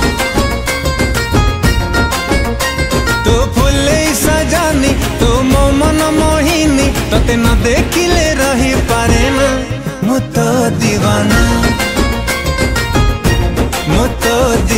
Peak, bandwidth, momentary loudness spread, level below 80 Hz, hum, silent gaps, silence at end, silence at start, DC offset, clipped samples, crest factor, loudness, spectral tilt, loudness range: 0 dBFS; 16.5 kHz; 4 LU; -18 dBFS; none; none; 0 s; 0 s; under 0.1%; under 0.1%; 12 dB; -12 LUFS; -4.5 dB/octave; 2 LU